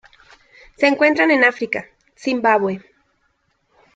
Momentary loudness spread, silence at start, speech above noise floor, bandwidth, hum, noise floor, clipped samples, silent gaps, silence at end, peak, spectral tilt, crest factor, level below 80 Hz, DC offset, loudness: 12 LU; 0.8 s; 49 dB; 9 kHz; none; -66 dBFS; under 0.1%; none; 1.15 s; -2 dBFS; -5 dB/octave; 18 dB; -62 dBFS; under 0.1%; -17 LUFS